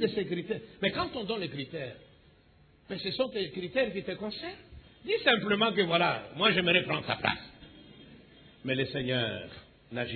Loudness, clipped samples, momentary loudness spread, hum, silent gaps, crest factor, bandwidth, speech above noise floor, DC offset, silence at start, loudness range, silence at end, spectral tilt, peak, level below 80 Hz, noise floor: -30 LUFS; under 0.1%; 16 LU; none; none; 22 dB; 4.6 kHz; 30 dB; under 0.1%; 0 s; 8 LU; 0 s; -8 dB/octave; -10 dBFS; -62 dBFS; -61 dBFS